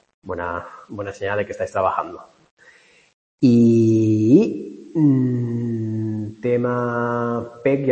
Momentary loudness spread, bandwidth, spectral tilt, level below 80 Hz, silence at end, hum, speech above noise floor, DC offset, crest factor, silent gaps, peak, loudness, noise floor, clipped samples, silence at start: 15 LU; 8.6 kHz; -8.5 dB/octave; -58 dBFS; 0 s; none; 34 dB; under 0.1%; 18 dB; 2.51-2.57 s, 3.14-3.38 s; -2 dBFS; -20 LUFS; -52 dBFS; under 0.1%; 0.25 s